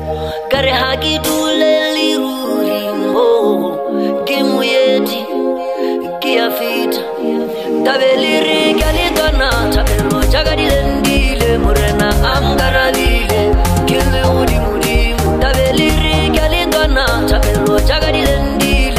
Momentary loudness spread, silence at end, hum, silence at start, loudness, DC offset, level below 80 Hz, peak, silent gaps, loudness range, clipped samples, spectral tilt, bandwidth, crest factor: 6 LU; 0 s; none; 0 s; -13 LUFS; 0.3%; -20 dBFS; 0 dBFS; none; 2 LU; under 0.1%; -5 dB/octave; 15.5 kHz; 12 dB